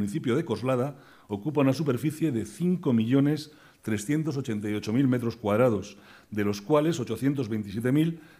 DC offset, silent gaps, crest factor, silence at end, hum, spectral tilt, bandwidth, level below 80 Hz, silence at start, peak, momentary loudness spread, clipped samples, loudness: under 0.1%; none; 18 dB; 0.2 s; none; -7 dB/octave; 15.5 kHz; -64 dBFS; 0 s; -8 dBFS; 9 LU; under 0.1%; -27 LUFS